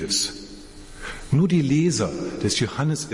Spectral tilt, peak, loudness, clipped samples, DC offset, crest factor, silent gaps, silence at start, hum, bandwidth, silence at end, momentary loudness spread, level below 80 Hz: -4.5 dB/octave; -8 dBFS; -22 LUFS; under 0.1%; under 0.1%; 16 dB; none; 0 s; none; 11.5 kHz; 0 s; 20 LU; -46 dBFS